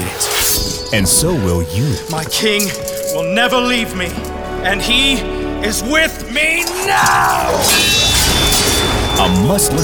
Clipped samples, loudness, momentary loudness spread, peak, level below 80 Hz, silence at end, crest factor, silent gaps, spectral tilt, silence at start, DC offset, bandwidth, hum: under 0.1%; -13 LUFS; 9 LU; 0 dBFS; -28 dBFS; 0 s; 14 dB; none; -3 dB/octave; 0 s; 0.4%; over 20 kHz; none